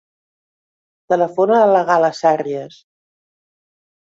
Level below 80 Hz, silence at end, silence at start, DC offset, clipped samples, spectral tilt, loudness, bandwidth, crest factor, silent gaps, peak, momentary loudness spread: -68 dBFS; 1.4 s; 1.1 s; under 0.1%; under 0.1%; -6 dB/octave; -15 LUFS; 7.8 kHz; 16 dB; none; -2 dBFS; 9 LU